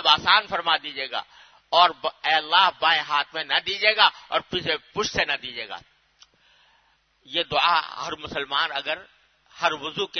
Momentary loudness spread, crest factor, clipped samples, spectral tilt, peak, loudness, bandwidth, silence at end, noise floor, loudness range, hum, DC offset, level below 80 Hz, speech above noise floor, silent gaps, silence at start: 13 LU; 24 dB; under 0.1%; -2 dB/octave; 0 dBFS; -22 LUFS; 6.6 kHz; 0 s; -64 dBFS; 7 LU; none; under 0.1%; -60 dBFS; 40 dB; none; 0 s